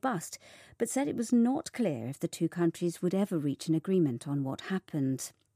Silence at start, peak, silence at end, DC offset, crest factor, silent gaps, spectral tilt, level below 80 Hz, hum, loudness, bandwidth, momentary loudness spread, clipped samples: 0.05 s; -18 dBFS; 0.25 s; under 0.1%; 14 dB; none; -6 dB/octave; -76 dBFS; none; -32 LUFS; 15.5 kHz; 9 LU; under 0.1%